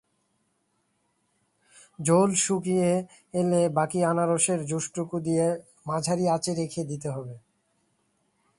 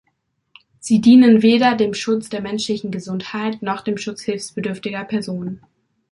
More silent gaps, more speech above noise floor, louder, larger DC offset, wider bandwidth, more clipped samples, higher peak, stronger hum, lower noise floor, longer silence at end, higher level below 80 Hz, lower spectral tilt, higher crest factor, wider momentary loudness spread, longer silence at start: neither; second, 48 dB vs 52 dB; second, -26 LUFS vs -18 LUFS; neither; about the same, 11.5 kHz vs 11.5 kHz; neither; second, -8 dBFS vs -2 dBFS; neither; first, -73 dBFS vs -69 dBFS; first, 1.2 s vs 0.55 s; second, -66 dBFS vs -60 dBFS; about the same, -5 dB/octave vs -5.5 dB/octave; about the same, 20 dB vs 16 dB; second, 10 LU vs 16 LU; first, 2 s vs 0.85 s